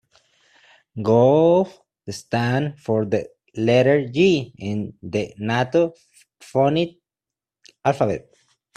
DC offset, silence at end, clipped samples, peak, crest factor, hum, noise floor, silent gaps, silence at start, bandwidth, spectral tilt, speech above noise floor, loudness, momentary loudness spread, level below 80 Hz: under 0.1%; 0.55 s; under 0.1%; -4 dBFS; 18 dB; none; -89 dBFS; none; 0.95 s; 12 kHz; -7 dB/octave; 69 dB; -21 LUFS; 13 LU; -60 dBFS